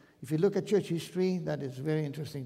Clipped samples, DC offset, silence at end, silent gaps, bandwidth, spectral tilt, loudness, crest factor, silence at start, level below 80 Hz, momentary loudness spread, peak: under 0.1%; under 0.1%; 0 s; none; 15.5 kHz; -7 dB/octave; -32 LUFS; 16 dB; 0.2 s; -70 dBFS; 7 LU; -14 dBFS